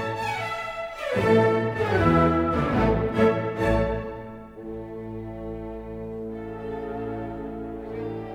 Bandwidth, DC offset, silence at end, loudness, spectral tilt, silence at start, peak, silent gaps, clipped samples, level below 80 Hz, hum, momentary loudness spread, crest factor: 14 kHz; under 0.1%; 0 s; -25 LUFS; -7.5 dB/octave; 0 s; -8 dBFS; none; under 0.1%; -40 dBFS; none; 16 LU; 18 dB